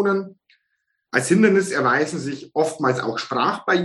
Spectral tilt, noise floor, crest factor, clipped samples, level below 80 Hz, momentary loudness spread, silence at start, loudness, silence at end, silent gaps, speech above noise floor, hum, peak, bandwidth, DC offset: -5 dB/octave; -74 dBFS; 18 dB; under 0.1%; -68 dBFS; 10 LU; 0 s; -20 LUFS; 0 s; none; 54 dB; none; -2 dBFS; 12 kHz; under 0.1%